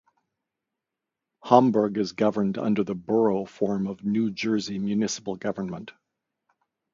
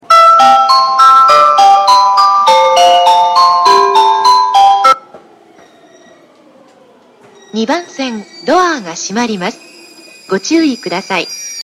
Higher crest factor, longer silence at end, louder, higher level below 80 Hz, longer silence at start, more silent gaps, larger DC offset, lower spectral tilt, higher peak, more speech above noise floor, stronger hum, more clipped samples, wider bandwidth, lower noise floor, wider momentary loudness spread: first, 26 dB vs 10 dB; first, 1.05 s vs 0 s; second, -25 LUFS vs -8 LUFS; second, -64 dBFS vs -58 dBFS; first, 1.45 s vs 0.1 s; neither; neither; first, -6 dB/octave vs -2.5 dB/octave; about the same, -2 dBFS vs 0 dBFS; first, 62 dB vs 29 dB; neither; second, under 0.1% vs 0.3%; second, 7.6 kHz vs 16 kHz; first, -86 dBFS vs -44 dBFS; about the same, 12 LU vs 14 LU